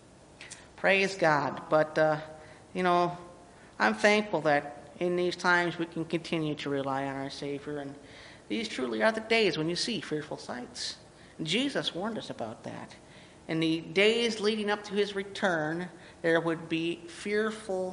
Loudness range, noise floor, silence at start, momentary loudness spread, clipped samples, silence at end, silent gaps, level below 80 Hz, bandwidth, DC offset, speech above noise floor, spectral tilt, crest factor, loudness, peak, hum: 5 LU; -51 dBFS; 0.2 s; 17 LU; under 0.1%; 0 s; none; -66 dBFS; 10.5 kHz; under 0.1%; 22 dB; -4.5 dB/octave; 20 dB; -29 LUFS; -10 dBFS; none